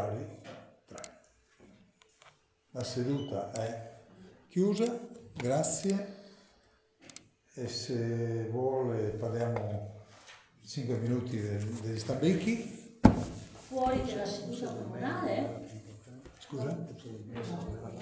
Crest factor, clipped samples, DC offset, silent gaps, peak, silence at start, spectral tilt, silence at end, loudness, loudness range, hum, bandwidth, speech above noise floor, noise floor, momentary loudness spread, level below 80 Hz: 30 dB; under 0.1%; under 0.1%; none; -4 dBFS; 0 s; -6 dB/octave; 0 s; -34 LUFS; 8 LU; none; 8 kHz; 33 dB; -67 dBFS; 21 LU; -52 dBFS